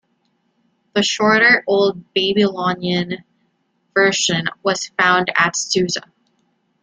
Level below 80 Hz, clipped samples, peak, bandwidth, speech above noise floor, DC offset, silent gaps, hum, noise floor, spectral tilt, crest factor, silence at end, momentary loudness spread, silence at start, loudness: -60 dBFS; under 0.1%; 0 dBFS; 9.6 kHz; 49 dB; under 0.1%; none; none; -66 dBFS; -3 dB/octave; 18 dB; 0.85 s; 10 LU; 0.95 s; -17 LUFS